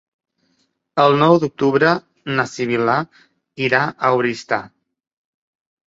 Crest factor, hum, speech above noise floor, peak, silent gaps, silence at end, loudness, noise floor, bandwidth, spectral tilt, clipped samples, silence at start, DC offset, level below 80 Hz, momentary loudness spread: 18 dB; none; 49 dB; -2 dBFS; none; 1.2 s; -18 LUFS; -66 dBFS; 8 kHz; -6 dB/octave; under 0.1%; 0.95 s; under 0.1%; -62 dBFS; 10 LU